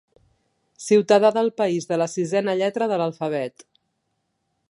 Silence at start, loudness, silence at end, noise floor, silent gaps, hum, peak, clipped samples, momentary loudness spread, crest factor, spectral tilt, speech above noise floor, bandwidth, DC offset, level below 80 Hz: 0.8 s; -21 LUFS; 1.2 s; -74 dBFS; none; none; -4 dBFS; under 0.1%; 10 LU; 18 dB; -5 dB/octave; 54 dB; 11.5 kHz; under 0.1%; -74 dBFS